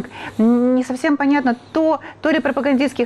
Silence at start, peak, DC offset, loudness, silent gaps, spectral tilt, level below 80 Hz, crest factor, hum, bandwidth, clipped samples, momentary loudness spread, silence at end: 0 s; -8 dBFS; under 0.1%; -18 LUFS; none; -5.5 dB/octave; -58 dBFS; 10 dB; none; 11.5 kHz; under 0.1%; 4 LU; 0 s